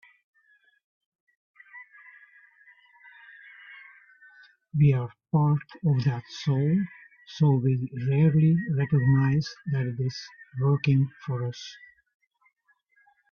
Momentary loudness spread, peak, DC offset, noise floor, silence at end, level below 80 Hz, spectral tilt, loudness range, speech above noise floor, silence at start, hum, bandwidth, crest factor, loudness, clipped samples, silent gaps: 24 LU; -12 dBFS; under 0.1%; -69 dBFS; 1.55 s; -60 dBFS; -8.5 dB/octave; 6 LU; 45 dB; 1.75 s; none; 6.8 kHz; 16 dB; -25 LUFS; under 0.1%; none